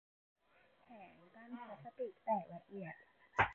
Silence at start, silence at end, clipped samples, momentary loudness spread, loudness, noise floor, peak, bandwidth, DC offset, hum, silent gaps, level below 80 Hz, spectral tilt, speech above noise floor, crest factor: 0.9 s; 0 s; under 0.1%; 20 LU; -44 LUFS; -72 dBFS; -20 dBFS; 4.3 kHz; under 0.1%; none; none; -68 dBFS; -3.5 dB/octave; 28 dB; 26 dB